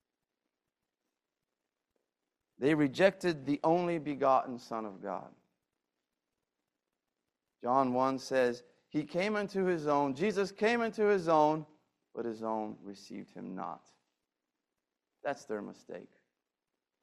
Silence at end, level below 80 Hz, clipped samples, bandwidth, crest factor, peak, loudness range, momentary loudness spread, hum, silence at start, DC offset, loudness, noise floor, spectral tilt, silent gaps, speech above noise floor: 1 s; -76 dBFS; under 0.1%; 12.5 kHz; 22 dB; -14 dBFS; 13 LU; 18 LU; none; 2.6 s; under 0.1%; -32 LUFS; -89 dBFS; -6 dB/octave; none; 57 dB